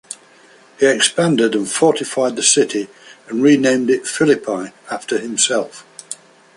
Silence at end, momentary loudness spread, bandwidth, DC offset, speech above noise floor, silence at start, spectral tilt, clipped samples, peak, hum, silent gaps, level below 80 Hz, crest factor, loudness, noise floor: 0.45 s; 19 LU; 11.5 kHz; under 0.1%; 31 dB; 0.1 s; -3 dB/octave; under 0.1%; 0 dBFS; none; none; -64 dBFS; 18 dB; -16 LUFS; -47 dBFS